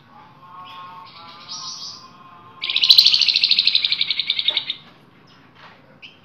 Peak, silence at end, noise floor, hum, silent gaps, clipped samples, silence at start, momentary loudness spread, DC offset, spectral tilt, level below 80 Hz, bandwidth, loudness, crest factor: 0 dBFS; 0.2 s; -50 dBFS; none; none; under 0.1%; 0.45 s; 26 LU; under 0.1%; 1 dB/octave; -70 dBFS; 16 kHz; -14 LUFS; 22 dB